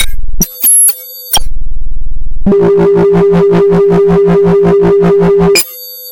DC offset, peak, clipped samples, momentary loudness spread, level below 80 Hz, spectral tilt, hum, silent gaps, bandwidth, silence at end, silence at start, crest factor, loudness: under 0.1%; 0 dBFS; under 0.1%; 18 LU; -18 dBFS; -4.5 dB/octave; none; none; 17.5 kHz; 0 s; 0 s; 6 dB; -8 LUFS